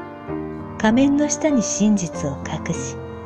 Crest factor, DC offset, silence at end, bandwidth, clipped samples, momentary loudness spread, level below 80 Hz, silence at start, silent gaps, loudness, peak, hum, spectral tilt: 16 dB; under 0.1%; 0 s; 9.4 kHz; under 0.1%; 13 LU; -46 dBFS; 0 s; none; -21 LUFS; -6 dBFS; none; -5 dB/octave